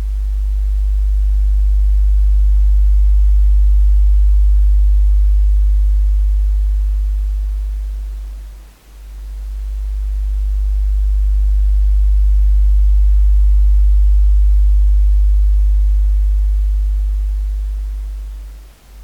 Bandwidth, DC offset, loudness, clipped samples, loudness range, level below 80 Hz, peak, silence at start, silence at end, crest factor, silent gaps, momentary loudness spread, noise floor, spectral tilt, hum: 0.6 kHz; under 0.1%; -16 LUFS; under 0.1%; 9 LU; -12 dBFS; -6 dBFS; 0 s; 0 s; 6 dB; none; 12 LU; -36 dBFS; -7 dB/octave; none